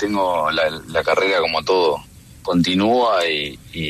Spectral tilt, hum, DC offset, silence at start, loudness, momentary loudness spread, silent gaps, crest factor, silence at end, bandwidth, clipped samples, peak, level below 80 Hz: -5 dB/octave; none; under 0.1%; 0 s; -18 LUFS; 7 LU; none; 14 dB; 0 s; 13.5 kHz; under 0.1%; -6 dBFS; -50 dBFS